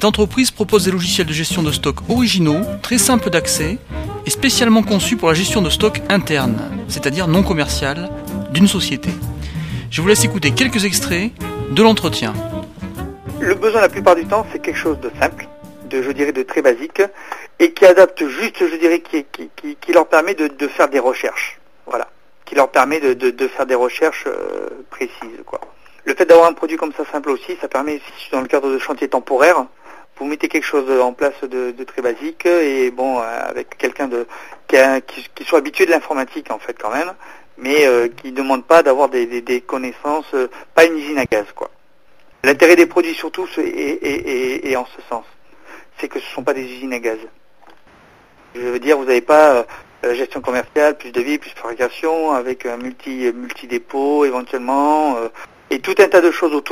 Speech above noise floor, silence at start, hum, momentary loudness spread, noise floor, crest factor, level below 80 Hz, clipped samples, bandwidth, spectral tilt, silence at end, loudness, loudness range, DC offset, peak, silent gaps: 38 dB; 0 s; none; 15 LU; -54 dBFS; 16 dB; -40 dBFS; under 0.1%; 15.5 kHz; -4.5 dB/octave; 0 s; -16 LUFS; 5 LU; 0.7%; 0 dBFS; none